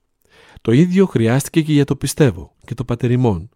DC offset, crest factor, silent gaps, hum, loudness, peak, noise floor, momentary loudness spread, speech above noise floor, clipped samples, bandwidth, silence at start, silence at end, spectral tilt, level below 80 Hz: under 0.1%; 16 dB; none; none; -16 LUFS; -2 dBFS; -51 dBFS; 12 LU; 35 dB; under 0.1%; 16.5 kHz; 0.65 s; 0.1 s; -6.5 dB/octave; -44 dBFS